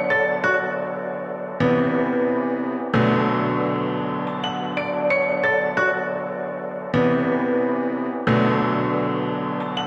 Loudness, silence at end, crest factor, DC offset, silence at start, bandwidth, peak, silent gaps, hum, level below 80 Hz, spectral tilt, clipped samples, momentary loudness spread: -22 LUFS; 0 s; 14 dB; under 0.1%; 0 s; 7.4 kHz; -8 dBFS; none; none; -58 dBFS; -7.5 dB/octave; under 0.1%; 8 LU